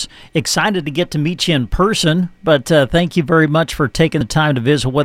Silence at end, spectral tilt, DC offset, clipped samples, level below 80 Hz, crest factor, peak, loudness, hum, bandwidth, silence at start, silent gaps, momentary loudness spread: 0 s; -5 dB/octave; under 0.1%; under 0.1%; -34 dBFS; 14 dB; 0 dBFS; -15 LUFS; none; 15 kHz; 0 s; none; 5 LU